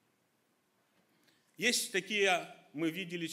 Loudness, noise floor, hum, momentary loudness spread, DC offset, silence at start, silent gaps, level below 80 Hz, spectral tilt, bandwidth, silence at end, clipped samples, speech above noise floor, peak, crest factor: -33 LUFS; -76 dBFS; none; 9 LU; under 0.1%; 1.6 s; none; under -90 dBFS; -2.5 dB/octave; 16 kHz; 0 s; under 0.1%; 42 dB; -16 dBFS; 22 dB